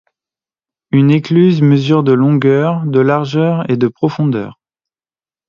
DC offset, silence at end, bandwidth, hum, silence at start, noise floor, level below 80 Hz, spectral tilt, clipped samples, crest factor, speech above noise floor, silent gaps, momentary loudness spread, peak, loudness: under 0.1%; 0.95 s; 7 kHz; none; 0.95 s; under -90 dBFS; -56 dBFS; -9 dB/octave; under 0.1%; 12 dB; over 79 dB; none; 6 LU; 0 dBFS; -12 LUFS